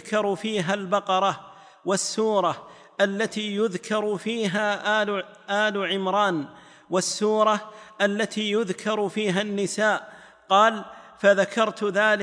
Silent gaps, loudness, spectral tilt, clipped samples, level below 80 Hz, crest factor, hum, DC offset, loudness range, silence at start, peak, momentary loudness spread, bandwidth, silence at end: none; -24 LUFS; -3.5 dB/octave; under 0.1%; -74 dBFS; 18 dB; none; under 0.1%; 2 LU; 0.05 s; -6 dBFS; 8 LU; 10.5 kHz; 0 s